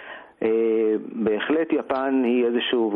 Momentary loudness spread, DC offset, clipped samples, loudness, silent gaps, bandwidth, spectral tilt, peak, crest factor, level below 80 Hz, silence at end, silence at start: 4 LU; under 0.1%; under 0.1%; -23 LUFS; none; 4.3 kHz; -8 dB/octave; -8 dBFS; 14 dB; -66 dBFS; 0 s; 0 s